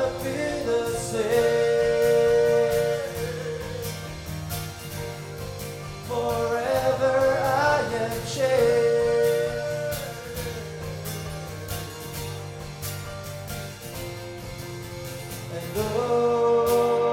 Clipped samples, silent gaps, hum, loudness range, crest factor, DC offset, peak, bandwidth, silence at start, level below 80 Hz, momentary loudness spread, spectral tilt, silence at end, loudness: under 0.1%; none; none; 12 LU; 16 dB; under 0.1%; -10 dBFS; 17 kHz; 0 s; -46 dBFS; 15 LU; -4.5 dB/octave; 0 s; -25 LUFS